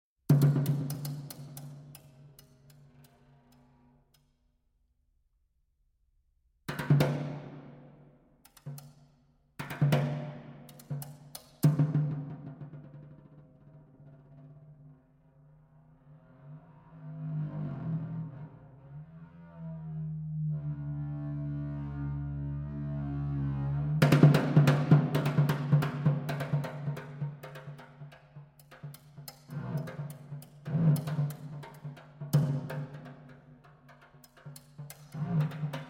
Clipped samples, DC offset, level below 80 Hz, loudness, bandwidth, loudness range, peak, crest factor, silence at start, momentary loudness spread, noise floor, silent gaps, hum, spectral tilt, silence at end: under 0.1%; under 0.1%; -58 dBFS; -31 LUFS; 16.5 kHz; 17 LU; -6 dBFS; 26 dB; 0.3 s; 25 LU; -73 dBFS; none; none; -7.5 dB/octave; 0 s